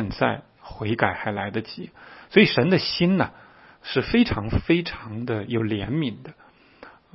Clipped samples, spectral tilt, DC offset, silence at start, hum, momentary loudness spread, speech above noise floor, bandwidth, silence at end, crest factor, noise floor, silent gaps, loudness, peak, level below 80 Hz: under 0.1%; -9.5 dB/octave; under 0.1%; 0 s; none; 17 LU; 26 dB; 6 kHz; 0.25 s; 22 dB; -49 dBFS; none; -23 LUFS; -2 dBFS; -44 dBFS